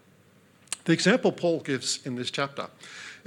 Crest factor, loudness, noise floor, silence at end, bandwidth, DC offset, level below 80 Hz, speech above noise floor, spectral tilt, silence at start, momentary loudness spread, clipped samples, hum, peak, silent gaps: 22 dB; -27 LUFS; -59 dBFS; 0.1 s; 16.5 kHz; under 0.1%; -78 dBFS; 31 dB; -4 dB/octave; 0.7 s; 17 LU; under 0.1%; none; -6 dBFS; none